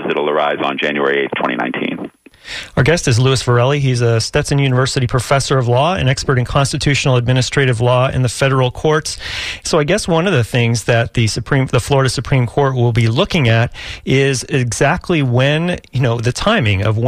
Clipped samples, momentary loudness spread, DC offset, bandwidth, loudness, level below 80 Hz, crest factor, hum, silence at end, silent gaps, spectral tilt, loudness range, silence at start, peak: under 0.1%; 5 LU; under 0.1%; 14 kHz; -15 LUFS; -36 dBFS; 12 dB; none; 0 s; none; -5.5 dB/octave; 1 LU; 0 s; -2 dBFS